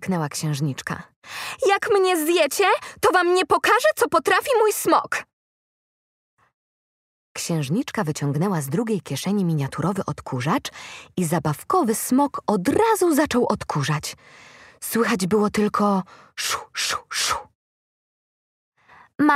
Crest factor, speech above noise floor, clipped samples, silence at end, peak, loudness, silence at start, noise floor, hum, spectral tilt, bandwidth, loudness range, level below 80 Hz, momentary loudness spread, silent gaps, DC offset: 18 dB; over 68 dB; under 0.1%; 0 s; -4 dBFS; -22 LUFS; 0 s; under -90 dBFS; none; -4.5 dB/octave; 16 kHz; 8 LU; -58 dBFS; 11 LU; 1.16-1.22 s, 5.33-6.37 s, 6.54-7.35 s, 17.55-18.72 s; under 0.1%